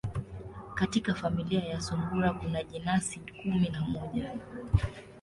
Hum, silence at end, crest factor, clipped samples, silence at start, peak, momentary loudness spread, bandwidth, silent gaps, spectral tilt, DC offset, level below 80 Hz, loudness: none; 0 s; 22 dB; under 0.1%; 0.05 s; -10 dBFS; 10 LU; 11.5 kHz; none; -6 dB/octave; under 0.1%; -46 dBFS; -32 LUFS